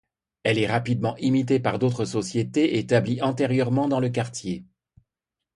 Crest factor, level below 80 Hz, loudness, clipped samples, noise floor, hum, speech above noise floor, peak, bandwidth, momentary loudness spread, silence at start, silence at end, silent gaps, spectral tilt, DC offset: 20 dB; -58 dBFS; -24 LUFS; under 0.1%; -87 dBFS; none; 63 dB; -4 dBFS; 11 kHz; 7 LU; 0.45 s; 0.95 s; none; -6.5 dB/octave; under 0.1%